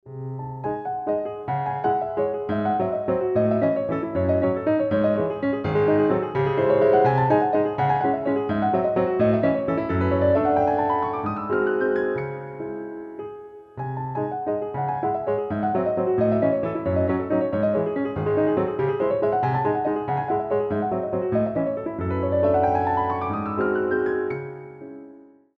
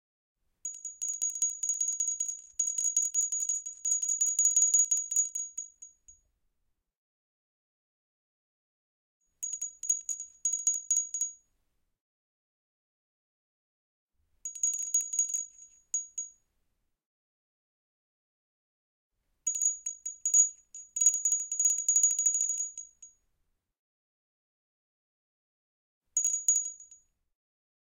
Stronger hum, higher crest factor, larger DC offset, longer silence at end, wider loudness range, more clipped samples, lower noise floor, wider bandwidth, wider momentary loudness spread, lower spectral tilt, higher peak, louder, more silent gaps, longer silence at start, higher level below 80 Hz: neither; second, 16 dB vs 22 dB; neither; second, 0.4 s vs 1.05 s; second, 6 LU vs 16 LU; neither; second, -48 dBFS vs -79 dBFS; second, 5.4 kHz vs 17 kHz; second, 11 LU vs 15 LU; first, -10 dB/octave vs 5 dB/octave; first, -8 dBFS vs -12 dBFS; first, -23 LUFS vs -27 LUFS; second, none vs 6.97-9.20 s, 12.01-14.07 s, 17.06-19.10 s, 23.79-26.01 s; second, 0.05 s vs 0.65 s; first, -54 dBFS vs -80 dBFS